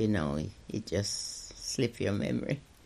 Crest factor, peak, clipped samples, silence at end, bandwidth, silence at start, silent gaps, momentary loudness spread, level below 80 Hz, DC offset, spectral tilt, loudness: 18 dB; -16 dBFS; under 0.1%; 0.2 s; 14.5 kHz; 0 s; none; 7 LU; -54 dBFS; under 0.1%; -5 dB/octave; -34 LUFS